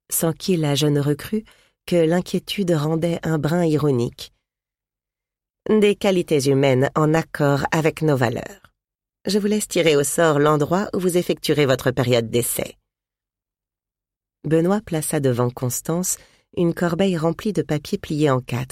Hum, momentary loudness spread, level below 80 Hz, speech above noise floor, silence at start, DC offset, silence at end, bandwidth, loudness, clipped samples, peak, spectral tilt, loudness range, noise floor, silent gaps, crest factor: 50 Hz at -50 dBFS; 8 LU; -52 dBFS; 69 dB; 0.1 s; under 0.1%; 0.05 s; 16.5 kHz; -20 LUFS; under 0.1%; -4 dBFS; -5.5 dB/octave; 4 LU; -89 dBFS; none; 18 dB